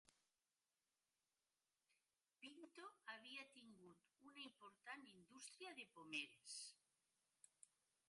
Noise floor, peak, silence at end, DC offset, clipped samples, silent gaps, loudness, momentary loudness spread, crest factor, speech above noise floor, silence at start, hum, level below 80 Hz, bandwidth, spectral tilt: under -90 dBFS; -36 dBFS; 0.4 s; under 0.1%; under 0.1%; none; -58 LUFS; 15 LU; 26 dB; over 31 dB; 0.05 s; none; under -90 dBFS; 11.5 kHz; -1 dB/octave